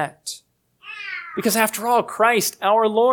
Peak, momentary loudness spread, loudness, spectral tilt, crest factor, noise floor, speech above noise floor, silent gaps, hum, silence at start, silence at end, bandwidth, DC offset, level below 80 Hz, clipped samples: -2 dBFS; 15 LU; -20 LUFS; -3 dB/octave; 18 dB; -53 dBFS; 35 dB; none; 60 Hz at -55 dBFS; 0 s; 0 s; 19 kHz; under 0.1%; -74 dBFS; under 0.1%